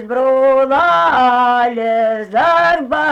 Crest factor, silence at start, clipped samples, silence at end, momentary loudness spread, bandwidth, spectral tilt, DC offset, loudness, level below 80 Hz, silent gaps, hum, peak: 8 dB; 0 s; under 0.1%; 0 s; 4 LU; 8.4 kHz; -5 dB/octave; under 0.1%; -13 LUFS; -50 dBFS; none; none; -4 dBFS